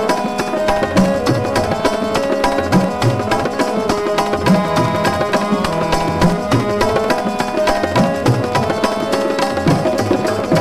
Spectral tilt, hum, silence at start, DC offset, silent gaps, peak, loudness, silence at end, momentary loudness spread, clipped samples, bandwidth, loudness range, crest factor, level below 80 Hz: -5.5 dB/octave; none; 0 s; 0.9%; none; -4 dBFS; -16 LUFS; 0 s; 3 LU; under 0.1%; 15 kHz; 0 LU; 12 dB; -36 dBFS